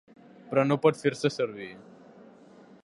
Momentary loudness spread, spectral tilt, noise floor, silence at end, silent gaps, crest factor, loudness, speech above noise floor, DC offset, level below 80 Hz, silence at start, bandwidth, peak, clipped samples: 14 LU; -6 dB/octave; -53 dBFS; 1 s; none; 22 dB; -27 LUFS; 27 dB; under 0.1%; -74 dBFS; 0.45 s; 11.5 kHz; -8 dBFS; under 0.1%